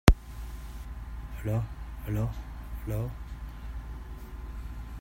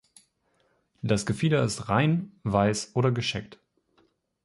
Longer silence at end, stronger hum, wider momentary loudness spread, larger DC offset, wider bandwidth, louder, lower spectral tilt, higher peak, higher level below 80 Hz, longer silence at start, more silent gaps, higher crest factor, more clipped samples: second, 0 s vs 0.9 s; neither; first, 11 LU vs 6 LU; neither; first, 16 kHz vs 11.5 kHz; second, -36 LUFS vs -26 LUFS; about the same, -6 dB/octave vs -5.5 dB/octave; first, 0 dBFS vs -8 dBFS; first, -34 dBFS vs -54 dBFS; second, 0.05 s vs 1.05 s; neither; first, 30 dB vs 20 dB; neither